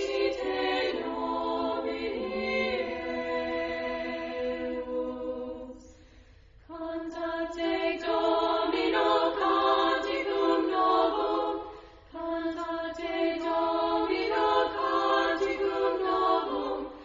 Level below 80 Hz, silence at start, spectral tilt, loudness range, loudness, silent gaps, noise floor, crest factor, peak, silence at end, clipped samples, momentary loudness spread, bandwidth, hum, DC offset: -56 dBFS; 0 s; -4.5 dB/octave; 8 LU; -29 LUFS; none; -55 dBFS; 16 dB; -12 dBFS; 0 s; under 0.1%; 10 LU; 7.6 kHz; none; under 0.1%